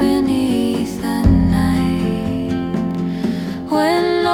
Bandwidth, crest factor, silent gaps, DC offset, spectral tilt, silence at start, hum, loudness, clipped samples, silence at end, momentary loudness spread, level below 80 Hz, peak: 17.5 kHz; 12 dB; none; under 0.1%; -7 dB/octave; 0 s; none; -18 LUFS; under 0.1%; 0 s; 6 LU; -30 dBFS; -4 dBFS